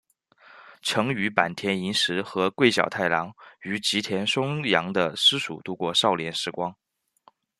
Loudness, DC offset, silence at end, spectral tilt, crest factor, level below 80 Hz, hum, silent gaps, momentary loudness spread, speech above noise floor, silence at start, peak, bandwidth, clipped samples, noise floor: -24 LUFS; under 0.1%; 0.85 s; -3.5 dB/octave; 24 dB; -68 dBFS; none; none; 11 LU; 36 dB; 0.5 s; -2 dBFS; 13.5 kHz; under 0.1%; -61 dBFS